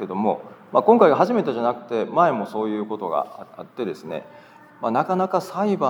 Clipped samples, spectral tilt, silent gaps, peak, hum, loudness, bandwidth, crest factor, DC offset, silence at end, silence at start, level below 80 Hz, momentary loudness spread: under 0.1%; -7.5 dB/octave; none; 0 dBFS; none; -21 LUFS; 19 kHz; 22 dB; under 0.1%; 0 s; 0 s; -80 dBFS; 17 LU